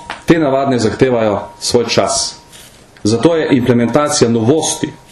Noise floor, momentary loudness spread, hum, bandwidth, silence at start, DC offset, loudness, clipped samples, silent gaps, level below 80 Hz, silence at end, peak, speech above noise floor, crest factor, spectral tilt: -39 dBFS; 5 LU; none; 13 kHz; 0 s; under 0.1%; -13 LUFS; under 0.1%; none; -44 dBFS; 0.15 s; 0 dBFS; 27 dB; 14 dB; -4.5 dB/octave